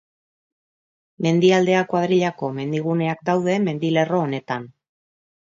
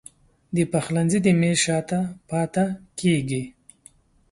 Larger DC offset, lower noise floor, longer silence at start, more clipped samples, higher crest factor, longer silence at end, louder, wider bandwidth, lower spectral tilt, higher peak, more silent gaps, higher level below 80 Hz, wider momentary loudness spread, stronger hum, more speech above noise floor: neither; first, under -90 dBFS vs -55 dBFS; first, 1.2 s vs 0.5 s; neither; about the same, 18 dB vs 18 dB; about the same, 0.9 s vs 0.8 s; about the same, -21 LUFS vs -23 LUFS; second, 7.6 kHz vs 11.5 kHz; about the same, -6.5 dB/octave vs -5.5 dB/octave; about the same, -4 dBFS vs -6 dBFS; neither; second, -68 dBFS vs -56 dBFS; about the same, 10 LU vs 9 LU; neither; first, over 70 dB vs 32 dB